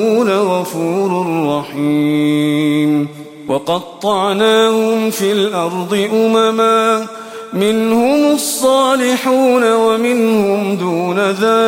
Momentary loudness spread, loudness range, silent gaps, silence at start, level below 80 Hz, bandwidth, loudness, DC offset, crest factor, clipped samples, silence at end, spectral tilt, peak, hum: 7 LU; 3 LU; none; 0 s; -60 dBFS; 16.5 kHz; -14 LUFS; under 0.1%; 12 dB; under 0.1%; 0 s; -5 dB/octave; 0 dBFS; none